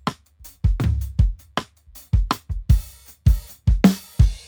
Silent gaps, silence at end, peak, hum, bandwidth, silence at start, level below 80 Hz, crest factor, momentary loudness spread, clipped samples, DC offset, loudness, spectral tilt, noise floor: none; 0.1 s; -2 dBFS; none; over 20 kHz; 0.05 s; -24 dBFS; 18 dB; 12 LU; under 0.1%; under 0.1%; -22 LUFS; -7 dB/octave; -47 dBFS